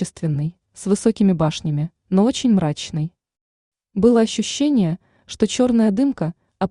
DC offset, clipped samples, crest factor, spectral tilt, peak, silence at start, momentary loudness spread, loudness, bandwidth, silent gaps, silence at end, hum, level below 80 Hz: under 0.1%; under 0.1%; 16 dB; -6 dB/octave; -4 dBFS; 0 s; 11 LU; -19 LUFS; 11 kHz; 3.41-3.72 s; 0.05 s; none; -52 dBFS